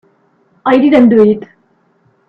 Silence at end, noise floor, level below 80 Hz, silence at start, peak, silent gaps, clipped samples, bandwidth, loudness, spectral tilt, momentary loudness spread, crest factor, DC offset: 0.85 s; -55 dBFS; -52 dBFS; 0.65 s; 0 dBFS; none; under 0.1%; 5.4 kHz; -10 LUFS; -8.5 dB/octave; 13 LU; 12 dB; under 0.1%